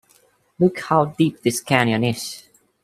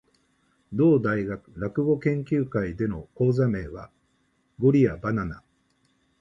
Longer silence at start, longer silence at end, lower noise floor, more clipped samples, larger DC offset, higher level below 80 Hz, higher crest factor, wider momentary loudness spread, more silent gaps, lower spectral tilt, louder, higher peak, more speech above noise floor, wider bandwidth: about the same, 0.6 s vs 0.7 s; second, 0.45 s vs 0.8 s; second, -58 dBFS vs -69 dBFS; neither; neither; second, -60 dBFS vs -50 dBFS; about the same, 20 dB vs 18 dB; about the same, 11 LU vs 13 LU; neither; second, -5 dB/octave vs -10 dB/octave; first, -20 LUFS vs -25 LUFS; first, 0 dBFS vs -8 dBFS; second, 39 dB vs 45 dB; first, 15.5 kHz vs 7.4 kHz